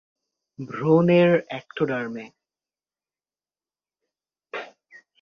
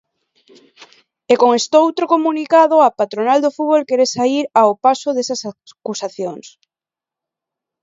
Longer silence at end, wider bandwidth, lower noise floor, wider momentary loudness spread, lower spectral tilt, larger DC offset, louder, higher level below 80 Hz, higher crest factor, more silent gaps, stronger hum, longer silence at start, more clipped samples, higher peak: second, 0.55 s vs 1.35 s; second, 6.6 kHz vs 7.8 kHz; about the same, under -90 dBFS vs -89 dBFS; first, 20 LU vs 14 LU; first, -8.5 dB/octave vs -3.5 dB/octave; neither; second, -21 LUFS vs -15 LUFS; about the same, -68 dBFS vs -70 dBFS; about the same, 20 dB vs 16 dB; neither; neither; second, 0.6 s vs 0.8 s; neither; second, -6 dBFS vs 0 dBFS